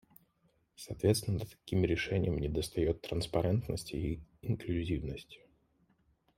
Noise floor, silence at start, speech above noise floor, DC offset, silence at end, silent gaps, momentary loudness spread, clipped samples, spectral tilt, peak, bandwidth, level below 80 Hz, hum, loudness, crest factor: -74 dBFS; 0.8 s; 40 dB; under 0.1%; 1 s; none; 11 LU; under 0.1%; -6 dB/octave; -14 dBFS; 16 kHz; -50 dBFS; none; -35 LUFS; 20 dB